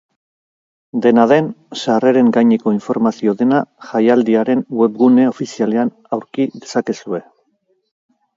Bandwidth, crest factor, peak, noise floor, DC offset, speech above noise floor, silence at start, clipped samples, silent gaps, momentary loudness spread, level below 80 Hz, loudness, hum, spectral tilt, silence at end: 7.6 kHz; 16 dB; 0 dBFS; -64 dBFS; under 0.1%; 49 dB; 0.95 s; under 0.1%; none; 12 LU; -64 dBFS; -15 LUFS; none; -6.5 dB/octave; 1.15 s